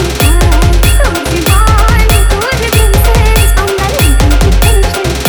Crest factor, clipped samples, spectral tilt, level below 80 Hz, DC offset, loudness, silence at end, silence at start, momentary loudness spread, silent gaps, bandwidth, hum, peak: 6 dB; 0.1%; -4.5 dB/octave; -10 dBFS; under 0.1%; -9 LUFS; 0 s; 0 s; 3 LU; none; over 20 kHz; none; 0 dBFS